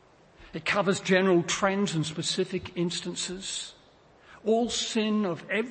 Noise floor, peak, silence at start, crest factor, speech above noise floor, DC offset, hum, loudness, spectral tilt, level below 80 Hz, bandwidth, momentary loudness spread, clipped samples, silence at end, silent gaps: -57 dBFS; -10 dBFS; 0.4 s; 18 dB; 30 dB; under 0.1%; none; -28 LUFS; -4 dB/octave; -62 dBFS; 8.8 kHz; 10 LU; under 0.1%; 0 s; none